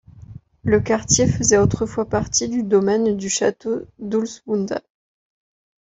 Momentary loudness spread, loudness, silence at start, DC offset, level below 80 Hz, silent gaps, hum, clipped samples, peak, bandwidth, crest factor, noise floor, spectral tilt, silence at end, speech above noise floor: 11 LU; -20 LUFS; 0.15 s; under 0.1%; -44 dBFS; none; none; under 0.1%; -2 dBFS; 8.2 kHz; 20 dB; -41 dBFS; -4.5 dB/octave; 1.05 s; 22 dB